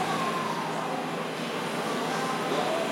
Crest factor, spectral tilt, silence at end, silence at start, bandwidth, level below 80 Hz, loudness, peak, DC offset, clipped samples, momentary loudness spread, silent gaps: 16 dB; -4 dB/octave; 0 s; 0 s; 16.5 kHz; -78 dBFS; -30 LUFS; -14 dBFS; under 0.1%; under 0.1%; 4 LU; none